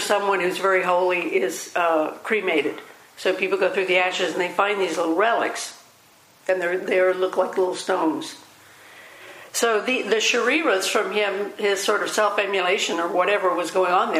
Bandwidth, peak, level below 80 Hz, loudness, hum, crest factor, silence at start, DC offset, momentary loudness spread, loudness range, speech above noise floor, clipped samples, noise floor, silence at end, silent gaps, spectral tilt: 15.5 kHz; -4 dBFS; -80 dBFS; -22 LUFS; none; 18 dB; 0 s; under 0.1%; 7 LU; 3 LU; 32 dB; under 0.1%; -54 dBFS; 0 s; none; -2.5 dB/octave